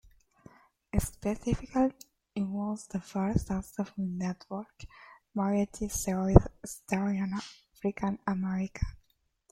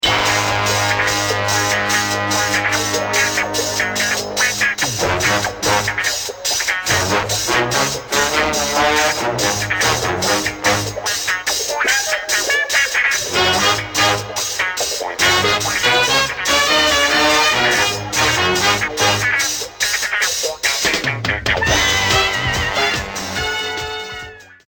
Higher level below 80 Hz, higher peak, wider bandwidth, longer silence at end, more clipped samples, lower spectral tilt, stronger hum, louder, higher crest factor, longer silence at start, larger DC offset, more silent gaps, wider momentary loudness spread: about the same, -40 dBFS vs -40 dBFS; about the same, -2 dBFS vs -4 dBFS; about the same, 16 kHz vs 17.5 kHz; first, 0.6 s vs 0.15 s; neither; first, -6.5 dB/octave vs -1.5 dB/octave; neither; second, -32 LUFS vs -16 LUFS; first, 28 dB vs 14 dB; first, 0.95 s vs 0 s; neither; neither; first, 12 LU vs 6 LU